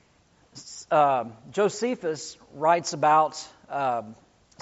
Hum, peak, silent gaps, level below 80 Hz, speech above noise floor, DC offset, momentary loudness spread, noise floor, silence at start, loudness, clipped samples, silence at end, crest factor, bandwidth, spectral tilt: none; -8 dBFS; none; -70 dBFS; 37 dB; under 0.1%; 19 LU; -61 dBFS; 0.55 s; -25 LUFS; under 0.1%; 0.5 s; 18 dB; 8 kHz; -3.5 dB/octave